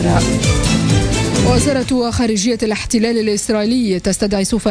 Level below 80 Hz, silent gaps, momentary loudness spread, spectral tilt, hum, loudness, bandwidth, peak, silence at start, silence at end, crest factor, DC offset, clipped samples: -28 dBFS; none; 3 LU; -5 dB/octave; none; -15 LUFS; 11 kHz; -2 dBFS; 0 s; 0 s; 12 dB; under 0.1%; under 0.1%